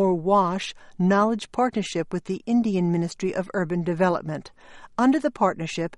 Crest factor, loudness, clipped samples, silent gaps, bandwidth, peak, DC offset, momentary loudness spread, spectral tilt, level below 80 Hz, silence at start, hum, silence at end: 16 dB; -24 LUFS; under 0.1%; none; 11 kHz; -8 dBFS; under 0.1%; 9 LU; -6.5 dB/octave; -58 dBFS; 0 s; none; 0 s